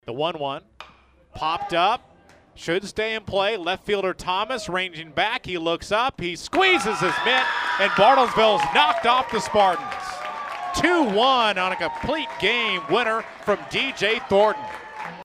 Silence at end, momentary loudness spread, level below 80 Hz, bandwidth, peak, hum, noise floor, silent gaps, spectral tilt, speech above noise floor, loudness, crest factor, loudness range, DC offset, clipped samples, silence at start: 0 s; 12 LU; -52 dBFS; 15.5 kHz; -4 dBFS; none; -53 dBFS; none; -3.5 dB/octave; 31 dB; -22 LUFS; 18 dB; 7 LU; under 0.1%; under 0.1%; 0.05 s